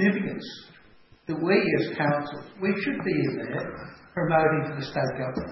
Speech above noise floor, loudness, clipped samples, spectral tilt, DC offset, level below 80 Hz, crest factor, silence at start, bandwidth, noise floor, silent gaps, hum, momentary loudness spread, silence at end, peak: 28 dB; -27 LUFS; under 0.1%; -8 dB/octave; under 0.1%; -58 dBFS; 18 dB; 0 s; 6 kHz; -55 dBFS; none; none; 15 LU; 0 s; -8 dBFS